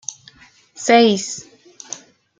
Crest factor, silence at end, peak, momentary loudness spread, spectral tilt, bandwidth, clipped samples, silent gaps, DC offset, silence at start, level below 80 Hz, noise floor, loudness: 18 dB; 0.45 s; -2 dBFS; 20 LU; -3 dB/octave; 9.6 kHz; under 0.1%; none; under 0.1%; 0.8 s; -66 dBFS; -49 dBFS; -16 LUFS